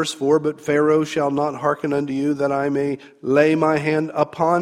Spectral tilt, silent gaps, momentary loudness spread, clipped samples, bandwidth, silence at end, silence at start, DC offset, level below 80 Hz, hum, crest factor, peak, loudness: -6 dB/octave; none; 6 LU; under 0.1%; 13 kHz; 0 s; 0 s; under 0.1%; -62 dBFS; none; 18 dB; -2 dBFS; -20 LUFS